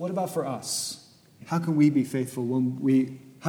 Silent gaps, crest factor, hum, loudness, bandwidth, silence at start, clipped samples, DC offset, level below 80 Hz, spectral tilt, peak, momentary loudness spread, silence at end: none; 16 dB; none; -26 LUFS; 18 kHz; 0 s; under 0.1%; under 0.1%; -76 dBFS; -5.5 dB/octave; -10 dBFS; 10 LU; 0 s